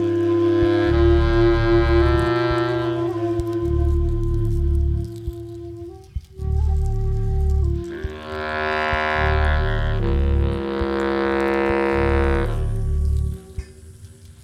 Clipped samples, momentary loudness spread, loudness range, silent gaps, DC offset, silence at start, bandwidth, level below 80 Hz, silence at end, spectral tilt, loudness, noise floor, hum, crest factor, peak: under 0.1%; 14 LU; 6 LU; none; under 0.1%; 0 s; 9.6 kHz; -24 dBFS; 0.1 s; -8 dB/octave; -21 LUFS; -42 dBFS; none; 16 dB; -4 dBFS